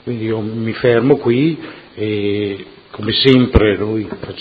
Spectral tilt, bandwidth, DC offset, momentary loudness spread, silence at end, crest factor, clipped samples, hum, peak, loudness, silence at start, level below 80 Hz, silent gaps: -8.5 dB/octave; 6.4 kHz; under 0.1%; 15 LU; 0 s; 16 dB; under 0.1%; none; 0 dBFS; -15 LUFS; 0.05 s; -32 dBFS; none